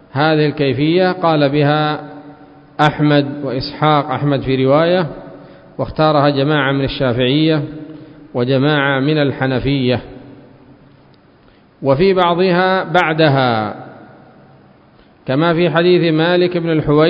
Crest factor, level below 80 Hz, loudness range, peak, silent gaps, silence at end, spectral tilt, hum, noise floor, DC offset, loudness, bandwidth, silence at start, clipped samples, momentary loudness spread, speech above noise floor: 16 dB; -44 dBFS; 2 LU; 0 dBFS; none; 0 s; -8.5 dB/octave; none; -48 dBFS; under 0.1%; -15 LUFS; 7.4 kHz; 0.15 s; under 0.1%; 12 LU; 34 dB